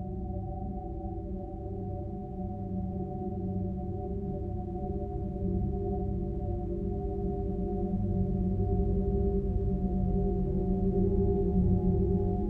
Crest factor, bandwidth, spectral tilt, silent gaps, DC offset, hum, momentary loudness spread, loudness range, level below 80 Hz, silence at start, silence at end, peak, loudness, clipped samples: 16 dB; 2.1 kHz; -13 dB/octave; none; under 0.1%; none; 10 LU; 7 LU; -36 dBFS; 0 s; 0 s; -14 dBFS; -32 LUFS; under 0.1%